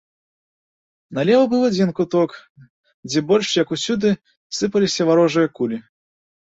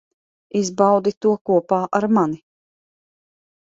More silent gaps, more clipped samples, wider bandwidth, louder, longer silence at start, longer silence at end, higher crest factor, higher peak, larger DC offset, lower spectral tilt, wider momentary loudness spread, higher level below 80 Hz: first, 2.50-2.55 s, 2.70-2.84 s, 2.94-3.03 s, 4.37-4.50 s vs 1.17-1.21 s, 1.41-1.45 s; neither; about the same, 8 kHz vs 7.8 kHz; about the same, -19 LUFS vs -19 LUFS; first, 1.1 s vs 0.55 s; second, 0.75 s vs 1.4 s; about the same, 16 dB vs 18 dB; about the same, -4 dBFS vs -2 dBFS; neither; second, -5 dB/octave vs -6.5 dB/octave; first, 10 LU vs 7 LU; about the same, -62 dBFS vs -64 dBFS